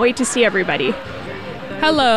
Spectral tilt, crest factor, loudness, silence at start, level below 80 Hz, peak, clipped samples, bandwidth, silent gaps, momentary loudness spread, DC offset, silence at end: -3 dB/octave; 16 dB; -17 LUFS; 0 s; -46 dBFS; -2 dBFS; under 0.1%; 13.5 kHz; none; 14 LU; 0.9%; 0 s